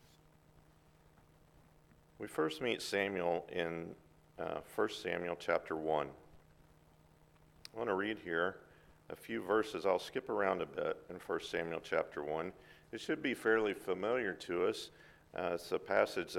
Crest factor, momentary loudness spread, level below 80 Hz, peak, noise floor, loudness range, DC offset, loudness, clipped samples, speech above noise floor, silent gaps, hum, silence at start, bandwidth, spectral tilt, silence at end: 24 dB; 13 LU; -70 dBFS; -16 dBFS; -66 dBFS; 3 LU; under 0.1%; -38 LUFS; under 0.1%; 28 dB; none; none; 2.2 s; 17 kHz; -4.5 dB/octave; 0 s